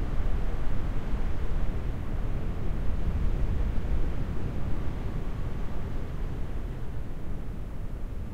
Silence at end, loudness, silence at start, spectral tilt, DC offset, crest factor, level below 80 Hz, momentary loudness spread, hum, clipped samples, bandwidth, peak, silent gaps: 0 s; -35 LUFS; 0 s; -8 dB/octave; under 0.1%; 12 dB; -30 dBFS; 7 LU; none; under 0.1%; 5.2 kHz; -14 dBFS; none